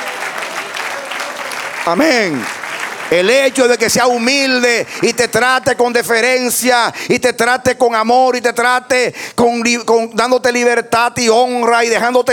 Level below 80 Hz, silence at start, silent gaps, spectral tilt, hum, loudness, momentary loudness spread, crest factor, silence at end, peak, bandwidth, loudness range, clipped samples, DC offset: -54 dBFS; 0 s; none; -2.5 dB/octave; none; -13 LUFS; 10 LU; 12 dB; 0 s; 0 dBFS; 18.5 kHz; 2 LU; under 0.1%; under 0.1%